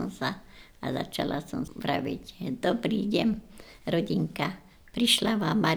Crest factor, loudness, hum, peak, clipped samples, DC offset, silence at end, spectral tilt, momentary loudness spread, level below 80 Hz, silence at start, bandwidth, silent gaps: 20 dB; -29 LUFS; none; -10 dBFS; under 0.1%; under 0.1%; 0 s; -4.5 dB/octave; 13 LU; -54 dBFS; 0 s; over 20 kHz; none